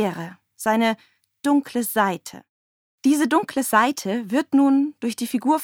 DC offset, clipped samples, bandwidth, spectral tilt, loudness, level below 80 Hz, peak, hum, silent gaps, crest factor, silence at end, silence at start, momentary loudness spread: under 0.1%; under 0.1%; 18.5 kHz; -4 dB/octave; -21 LUFS; -72 dBFS; -4 dBFS; none; 2.49-2.98 s; 18 dB; 0 s; 0 s; 11 LU